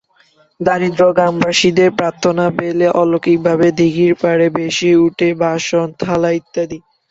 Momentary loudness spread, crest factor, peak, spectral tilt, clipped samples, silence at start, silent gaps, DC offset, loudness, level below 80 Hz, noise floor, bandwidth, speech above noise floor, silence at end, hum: 6 LU; 14 dB; 0 dBFS; -5.5 dB/octave; under 0.1%; 0.6 s; none; under 0.1%; -14 LUFS; -52 dBFS; -53 dBFS; 8 kHz; 40 dB; 0.35 s; none